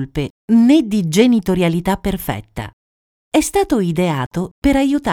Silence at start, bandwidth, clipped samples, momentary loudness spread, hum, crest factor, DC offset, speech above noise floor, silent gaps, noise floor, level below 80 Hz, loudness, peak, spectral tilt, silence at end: 0 s; 17.5 kHz; under 0.1%; 12 LU; none; 16 dB; under 0.1%; over 74 dB; 0.30-0.48 s, 2.73-3.32 s, 4.26-4.31 s, 4.51-4.62 s; under -90 dBFS; -36 dBFS; -16 LUFS; 0 dBFS; -6 dB/octave; 0 s